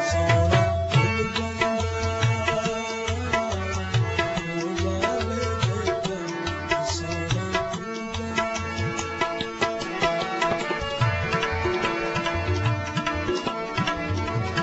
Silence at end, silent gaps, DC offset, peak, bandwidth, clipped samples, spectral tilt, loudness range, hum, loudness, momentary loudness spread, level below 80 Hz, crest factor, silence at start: 0 s; none; under 0.1%; -8 dBFS; 8.2 kHz; under 0.1%; -5 dB/octave; 3 LU; none; -25 LUFS; 6 LU; -42 dBFS; 18 dB; 0 s